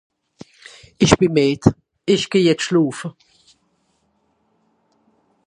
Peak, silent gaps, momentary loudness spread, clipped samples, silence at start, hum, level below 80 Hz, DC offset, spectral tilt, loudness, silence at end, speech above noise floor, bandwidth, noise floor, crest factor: 0 dBFS; none; 16 LU; under 0.1%; 1 s; none; -44 dBFS; under 0.1%; -5.5 dB/octave; -17 LUFS; 2.35 s; 49 dB; 11 kHz; -65 dBFS; 20 dB